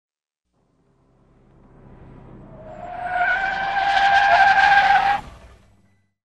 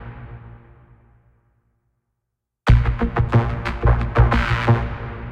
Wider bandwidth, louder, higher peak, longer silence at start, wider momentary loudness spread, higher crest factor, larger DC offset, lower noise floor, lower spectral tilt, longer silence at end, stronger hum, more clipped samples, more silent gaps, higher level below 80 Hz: first, 9.4 kHz vs 7 kHz; about the same, -17 LUFS vs -19 LUFS; about the same, -2 dBFS vs -2 dBFS; first, 2.35 s vs 0 s; about the same, 19 LU vs 20 LU; about the same, 20 dB vs 18 dB; neither; second, -75 dBFS vs -79 dBFS; second, -2.5 dB/octave vs -8 dB/octave; first, 1.1 s vs 0 s; neither; neither; neither; second, -48 dBFS vs -24 dBFS